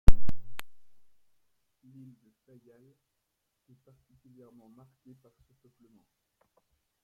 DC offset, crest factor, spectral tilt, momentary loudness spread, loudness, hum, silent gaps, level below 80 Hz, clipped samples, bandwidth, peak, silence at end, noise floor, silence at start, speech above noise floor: under 0.1%; 24 dB; -7 dB/octave; 21 LU; -40 LUFS; none; none; -36 dBFS; under 0.1%; 5.2 kHz; -2 dBFS; 6.35 s; -81 dBFS; 0.1 s; 21 dB